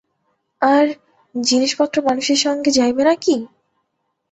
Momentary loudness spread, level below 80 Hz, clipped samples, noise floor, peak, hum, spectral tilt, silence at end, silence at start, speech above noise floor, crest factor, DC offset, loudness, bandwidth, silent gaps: 8 LU; -60 dBFS; under 0.1%; -72 dBFS; -2 dBFS; none; -2 dB/octave; 0.85 s; 0.6 s; 56 dB; 16 dB; under 0.1%; -17 LUFS; 8.2 kHz; none